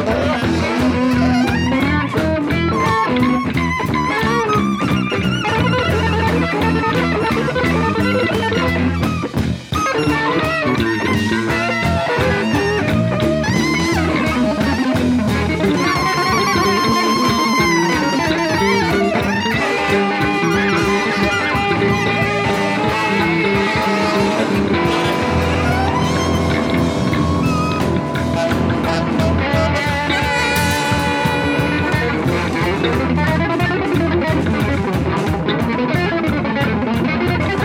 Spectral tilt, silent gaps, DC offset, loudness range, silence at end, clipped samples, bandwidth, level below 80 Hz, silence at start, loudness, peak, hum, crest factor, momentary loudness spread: -5.5 dB/octave; none; under 0.1%; 2 LU; 0 s; under 0.1%; 17 kHz; -34 dBFS; 0 s; -16 LUFS; -4 dBFS; none; 12 dB; 3 LU